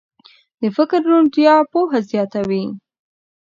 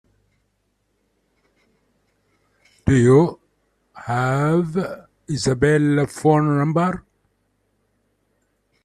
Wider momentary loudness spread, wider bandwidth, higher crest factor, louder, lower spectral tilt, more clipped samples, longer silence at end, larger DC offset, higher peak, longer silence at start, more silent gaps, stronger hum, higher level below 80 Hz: second, 11 LU vs 14 LU; second, 7.4 kHz vs 12.5 kHz; about the same, 16 dB vs 18 dB; first, -16 LUFS vs -19 LUFS; about the same, -7.5 dB/octave vs -7 dB/octave; neither; second, 0.7 s vs 1.85 s; neither; about the same, 0 dBFS vs -2 dBFS; second, 0.6 s vs 2.85 s; neither; neither; second, -64 dBFS vs -48 dBFS